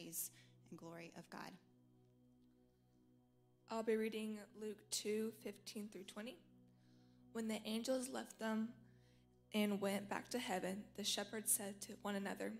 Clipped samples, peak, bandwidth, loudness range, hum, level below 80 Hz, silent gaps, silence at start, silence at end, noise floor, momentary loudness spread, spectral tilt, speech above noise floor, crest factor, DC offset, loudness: under 0.1%; -22 dBFS; 16 kHz; 9 LU; none; -82 dBFS; none; 0 s; 0 s; -74 dBFS; 15 LU; -3.5 dB/octave; 29 dB; 24 dB; under 0.1%; -45 LUFS